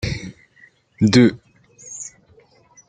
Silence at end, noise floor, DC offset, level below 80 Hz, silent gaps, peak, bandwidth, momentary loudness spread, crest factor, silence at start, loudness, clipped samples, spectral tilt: 0.8 s; -53 dBFS; under 0.1%; -46 dBFS; none; 0 dBFS; 9.4 kHz; 22 LU; 20 dB; 0.05 s; -17 LUFS; under 0.1%; -5.5 dB/octave